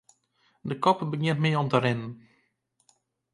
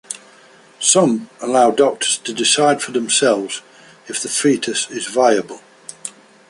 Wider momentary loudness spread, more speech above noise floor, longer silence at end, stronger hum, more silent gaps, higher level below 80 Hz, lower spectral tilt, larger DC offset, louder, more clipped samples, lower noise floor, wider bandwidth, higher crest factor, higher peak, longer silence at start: second, 13 LU vs 18 LU; first, 47 dB vs 30 dB; first, 1.15 s vs 0.4 s; neither; neither; about the same, -68 dBFS vs -66 dBFS; first, -7 dB/octave vs -2.5 dB/octave; neither; second, -26 LUFS vs -16 LUFS; neither; first, -72 dBFS vs -47 dBFS; about the same, 11 kHz vs 11.5 kHz; about the same, 22 dB vs 18 dB; second, -6 dBFS vs 0 dBFS; first, 0.65 s vs 0.1 s